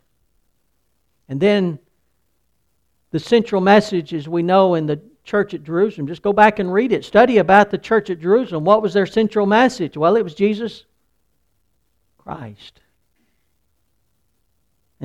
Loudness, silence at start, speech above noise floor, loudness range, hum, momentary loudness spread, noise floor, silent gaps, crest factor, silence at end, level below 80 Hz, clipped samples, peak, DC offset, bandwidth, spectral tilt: -17 LUFS; 1.3 s; 52 dB; 8 LU; none; 14 LU; -68 dBFS; none; 18 dB; 0 s; -56 dBFS; under 0.1%; 0 dBFS; under 0.1%; 10.5 kHz; -6.5 dB/octave